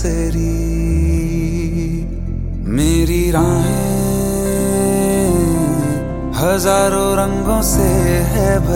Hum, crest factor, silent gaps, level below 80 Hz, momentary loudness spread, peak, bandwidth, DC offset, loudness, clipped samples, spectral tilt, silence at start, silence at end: none; 14 dB; none; -22 dBFS; 7 LU; 0 dBFS; 17 kHz; under 0.1%; -16 LUFS; under 0.1%; -6 dB/octave; 0 s; 0 s